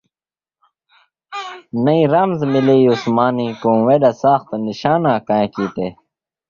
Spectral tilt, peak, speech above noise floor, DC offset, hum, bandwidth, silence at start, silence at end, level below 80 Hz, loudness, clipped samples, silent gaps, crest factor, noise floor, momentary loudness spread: -8 dB/octave; 0 dBFS; over 75 dB; under 0.1%; none; 7.2 kHz; 1.3 s; 0.55 s; -56 dBFS; -16 LUFS; under 0.1%; none; 16 dB; under -90 dBFS; 13 LU